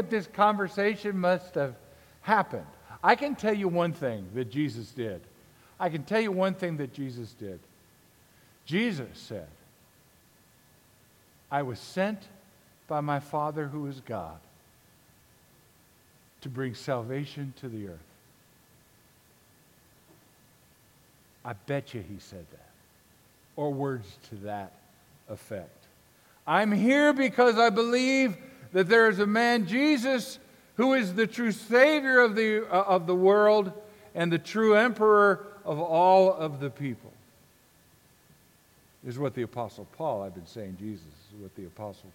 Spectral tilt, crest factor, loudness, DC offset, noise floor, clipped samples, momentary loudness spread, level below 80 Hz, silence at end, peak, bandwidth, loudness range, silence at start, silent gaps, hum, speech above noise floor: -6 dB/octave; 24 dB; -26 LUFS; under 0.1%; -61 dBFS; under 0.1%; 21 LU; -68 dBFS; 0.05 s; -6 dBFS; 17 kHz; 16 LU; 0 s; none; none; 34 dB